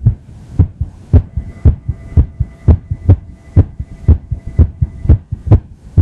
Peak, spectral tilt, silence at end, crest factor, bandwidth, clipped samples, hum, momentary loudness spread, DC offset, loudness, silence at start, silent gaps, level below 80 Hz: 0 dBFS; -11.5 dB/octave; 0 s; 12 dB; 2.6 kHz; 0.5%; none; 6 LU; under 0.1%; -15 LUFS; 0 s; none; -18 dBFS